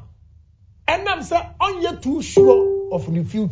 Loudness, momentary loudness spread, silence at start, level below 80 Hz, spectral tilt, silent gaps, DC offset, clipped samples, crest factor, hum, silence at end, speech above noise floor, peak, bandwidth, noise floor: -19 LUFS; 11 LU; 0 s; -44 dBFS; -6 dB/octave; none; under 0.1%; under 0.1%; 20 dB; none; 0 s; 33 dB; 0 dBFS; 8 kHz; -50 dBFS